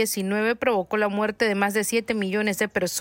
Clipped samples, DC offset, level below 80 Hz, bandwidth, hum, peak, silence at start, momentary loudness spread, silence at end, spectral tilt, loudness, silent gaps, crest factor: under 0.1%; under 0.1%; -60 dBFS; 16.5 kHz; none; -8 dBFS; 0 s; 2 LU; 0 s; -4 dB/octave; -24 LUFS; none; 14 dB